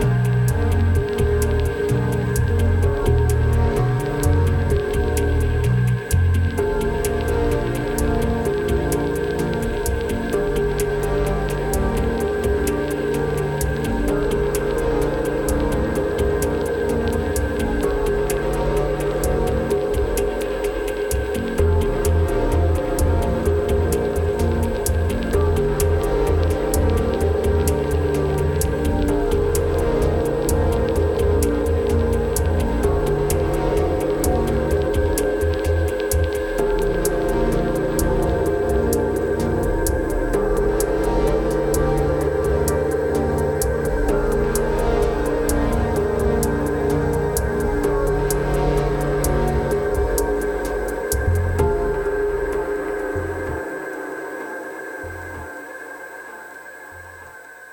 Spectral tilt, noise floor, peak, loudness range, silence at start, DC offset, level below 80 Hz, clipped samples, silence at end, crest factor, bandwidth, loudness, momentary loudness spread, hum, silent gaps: -6.5 dB/octave; -40 dBFS; -4 dBFS; 2 LU; 0 s; under 0.1%; -26 dBFS; under 0.1%; 0 s; 14 dB; 17.5 kHz; -21 LUFS; 4 LU; none; none